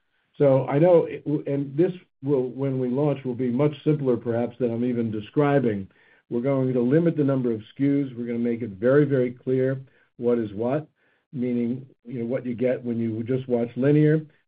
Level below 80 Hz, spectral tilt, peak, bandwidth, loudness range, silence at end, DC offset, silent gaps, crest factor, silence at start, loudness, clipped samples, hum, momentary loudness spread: -70 dBFS; -8.5 dB/octave; -6 dBFS; 4.5 kHz; 4 LU; 0.2 s; under 0.1%; 11.26-11.31 s; 16 dB; 0.4 s; -24 LUFS; under 0.1%; none; 9 LU